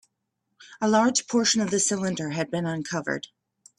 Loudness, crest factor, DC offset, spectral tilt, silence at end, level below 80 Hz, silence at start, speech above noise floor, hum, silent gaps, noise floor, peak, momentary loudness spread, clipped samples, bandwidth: -25 LUFS; 20 dB; under 0.1%; -3.5 dB/octave; 0.55 s; -68 dBFS; 0.6 s; 54 dB; none; none; -79 dBFS; -8 dBFS; 9 LU; under 0.1%; 12 kHz